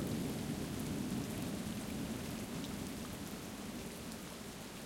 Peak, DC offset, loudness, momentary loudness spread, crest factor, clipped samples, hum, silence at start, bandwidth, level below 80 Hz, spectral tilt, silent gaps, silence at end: -26 dBFS; under 0.1%; -43 LUFS; 6 LU; 16 dB; under 0.1%; none; 0 s; 16.5 kHz; -58 dBFS; -5 dB/octave; none; 0 s